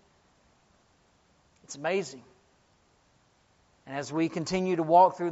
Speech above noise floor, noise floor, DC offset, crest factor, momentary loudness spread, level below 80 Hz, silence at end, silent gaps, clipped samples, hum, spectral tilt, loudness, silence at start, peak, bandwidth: 40 dB; -66 dBFS; under 0.1%; 22 dB; 20 LU; -68 dBFS; 0 s; none; under 0.1%; none; -5 dB/octave; -27 LUFS; 1.7 s; -8 dBFS; 8 kHz